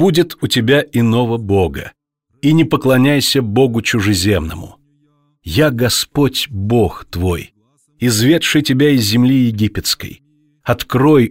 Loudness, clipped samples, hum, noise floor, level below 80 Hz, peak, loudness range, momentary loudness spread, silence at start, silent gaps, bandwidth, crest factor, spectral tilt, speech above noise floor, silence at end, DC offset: -14 LUFS; under 0.1%; none; -58 dBFS; -38 dBFS; -2 dBFS; 3 LU; 9 LU; 0 s; none; 16.5 kHz; 12 dB; -5 dB/octave; 45 dB; 0 s; under 0.1%